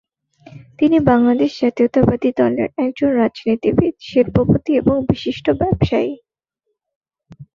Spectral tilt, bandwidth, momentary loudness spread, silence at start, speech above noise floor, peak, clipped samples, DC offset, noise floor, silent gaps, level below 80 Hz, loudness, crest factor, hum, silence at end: -8.5 dB/octave; 7 kHz; 6 LU; 0.55 s; 59 dB; -2 dBFS; under 0.1%; under 0.1%; -75 dBFS; 6.96-7.01 s; -40 dBFS; -17 LUFS; 16 dB; none; 0.1 s